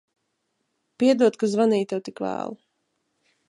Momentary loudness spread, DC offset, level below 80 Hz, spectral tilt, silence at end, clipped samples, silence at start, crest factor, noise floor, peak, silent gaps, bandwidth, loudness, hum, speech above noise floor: 12 LU; under 0.1%; -74 dBFS; -6 dB/octave; 0.95 s; under 0.1%; 1 s; 18 dB; -76 dBFS; -8 dBFS; none; 11 kHz; -23 LUFS; none; 54 dB